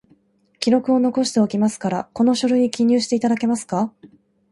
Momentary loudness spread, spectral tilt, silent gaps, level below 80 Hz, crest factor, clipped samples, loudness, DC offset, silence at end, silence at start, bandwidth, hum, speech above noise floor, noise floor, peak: 7 LU; -5 dB/octave; none; -62 dBFS; 18 dB; under 0.1%; -19 LUFS; under 0.1%; 0.45 s; 0.6 s; 11.5 kHz; none; 40 dB; -58 dBFS; -2 dBFS